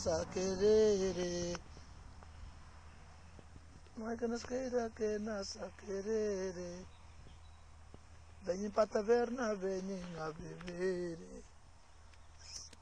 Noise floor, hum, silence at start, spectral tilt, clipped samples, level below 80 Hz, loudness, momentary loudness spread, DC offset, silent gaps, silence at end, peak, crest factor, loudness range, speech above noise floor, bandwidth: -61 dBFS; none; 0 s; -5 dB/octave; under 0.1%; -58 dBFS; -37 LUFS; 25 LU; under 0.1%; none; 0.05 s; -20 dBFS; 20 dB; 7 LU; 24 dB; 10 kHz